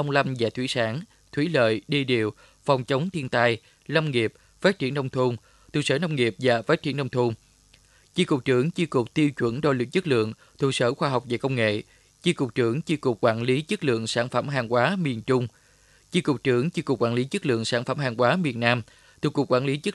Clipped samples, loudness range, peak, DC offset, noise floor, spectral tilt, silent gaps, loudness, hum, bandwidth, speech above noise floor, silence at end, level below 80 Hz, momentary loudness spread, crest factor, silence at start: under 0.1%; 1 LU; -4 dBFS; under 0.1%; -58 dBFS; -6 dB/octave; none; -25 LUFS; none; 12 kHz; 34 dB; 0 s; -62 dBFS; 6 LU; 22 dB; 0 s